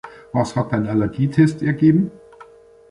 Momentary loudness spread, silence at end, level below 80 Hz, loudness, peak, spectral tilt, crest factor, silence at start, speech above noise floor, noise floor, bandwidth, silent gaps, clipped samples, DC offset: 7 LU; 0.5 s; -50 dBFS; -19 LUFS; -4 dBFS; -8 dB/octave; 16 dB; 0.05 s; 28 dB; -45 dBFS; 11 kHz; none; under 0.1%; under 0.1%